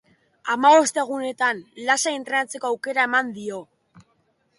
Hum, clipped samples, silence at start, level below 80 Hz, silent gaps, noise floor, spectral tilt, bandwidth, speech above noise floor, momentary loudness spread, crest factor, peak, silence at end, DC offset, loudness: none; under 0.1%; 0.45 s; -74 dBFS; none; -67 dBFS; -1.5 dB/octave; 11.5 kHz; 45 dB; 16 LU; 18 dB; -6 dBFS; 0.95 s; under 0.1%; -21 LUFS